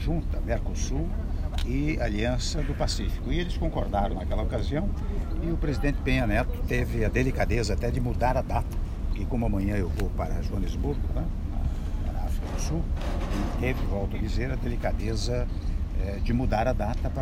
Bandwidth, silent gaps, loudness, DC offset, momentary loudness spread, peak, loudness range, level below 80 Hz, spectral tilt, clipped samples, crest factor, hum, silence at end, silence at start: 14.5 kHz; none; -29 LUFS; under 0.1%; 6 LU; -10 dBFS; 4 LU; -28 dBFS; -6.5 dB/octave; under 0.1%; 16 dB; none; 0 s; 0 s